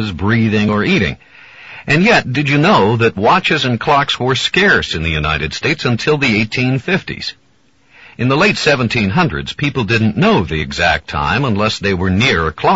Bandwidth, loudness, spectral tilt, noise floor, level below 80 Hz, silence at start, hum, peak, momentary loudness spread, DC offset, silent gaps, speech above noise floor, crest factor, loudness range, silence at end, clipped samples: 8 kHz; -14 LUFS; -4 dB/octave; -55 dBFS; -38 dBFS; 0 s; none; 0 dBFS; 7 LU; 0.2%; none; 41 dB; 14 dB; 3 LU; 0 s; under 0.1%